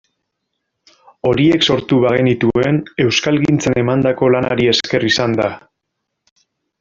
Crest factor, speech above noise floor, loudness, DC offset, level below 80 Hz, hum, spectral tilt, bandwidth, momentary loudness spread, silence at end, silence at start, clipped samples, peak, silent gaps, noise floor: 14 dB; 61 dB; -15 LUFS; under 0.1%; -48 dBFS; none; -5.5 dB/octave; 7.6 kHz; 5 LU; 1.25 s; 1.25 s; under 0.1%; -2 dBFS; none; -75 dBFS